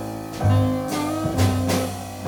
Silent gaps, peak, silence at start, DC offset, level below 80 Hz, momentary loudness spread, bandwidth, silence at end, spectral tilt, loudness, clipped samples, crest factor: none; -6 dBFS; 0 s; under 0.1%; -44 dBFS; 6 LU; 20 kHz; 0 s; -6 dB/octave; -22 LUFS; under 0.1%; 16 dB